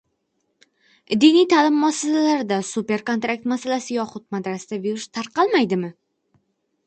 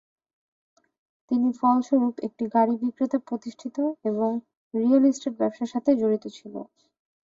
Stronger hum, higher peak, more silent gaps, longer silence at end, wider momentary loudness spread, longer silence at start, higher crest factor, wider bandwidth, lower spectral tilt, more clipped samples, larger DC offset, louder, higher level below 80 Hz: neither; first, -4 dBFS vs -10 dBFS; second, none vs 4.57-4.71 s; first, 0.95 s vs 0.6 s; about the same, 13 LU vs 13 LU; second, 1.1 s vs 1.3 s; about the same, 18 dB vs 16 dB; first, 9 kHz vs 7.6 kHz; second, -4.5 dB/octave vs -6.5 dB/octave; neither; neither; first, -20 LUFS vs -25 LUFS; about the same, -70 dBFS vs -72 dBFS